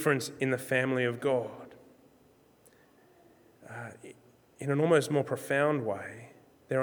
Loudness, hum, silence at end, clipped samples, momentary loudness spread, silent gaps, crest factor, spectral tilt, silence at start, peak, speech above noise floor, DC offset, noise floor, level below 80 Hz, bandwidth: -30 LUFS; none; 0 s; under 0.1%; 23 LU; none; 20 dB; -5.5 dB/octave; 0 s; -12 dBFS; 33 dB; under 0.1%; -63 dBFS; -78 dBFS; over 20 kHz